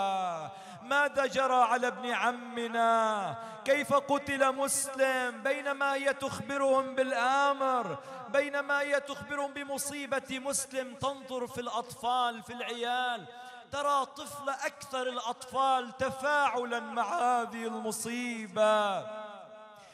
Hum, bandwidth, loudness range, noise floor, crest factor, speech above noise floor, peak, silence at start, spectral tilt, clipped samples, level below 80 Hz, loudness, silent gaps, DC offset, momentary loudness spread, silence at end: none; 15 kHz; 5 LU; -51 dBFS; 18 dB; 20 dB; -14 dBFS; 0 s; -2.5 dB/octave; under 0.1%; -72 dBFS; -31 LUFS; none; under 0.1%; 11 LU; 0 s